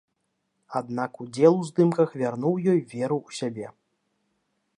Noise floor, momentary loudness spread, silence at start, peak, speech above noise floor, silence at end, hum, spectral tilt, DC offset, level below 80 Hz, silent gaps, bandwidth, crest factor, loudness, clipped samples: -77 dBFS; 13 LU; 0.7 s; -6 dBFS; 52 dB; 1.1 s; none; -7.5 dB/octave; under 0.1%; -74 dBFS; none; 11 kHz; 20 dB; -25 LUFS; under 0.1%